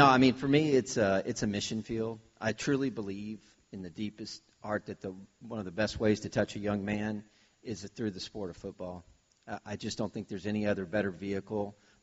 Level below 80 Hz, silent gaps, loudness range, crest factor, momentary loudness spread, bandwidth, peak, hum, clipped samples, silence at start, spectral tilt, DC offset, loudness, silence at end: -60 dBFS; none; 8 LU; 24 dB; 16 LU; 8 kHz; -8 dBFS; none; under 0.1%; 0 s; -4.5 dB/octave; under 0.1%; -33 LUFS; 0.3 s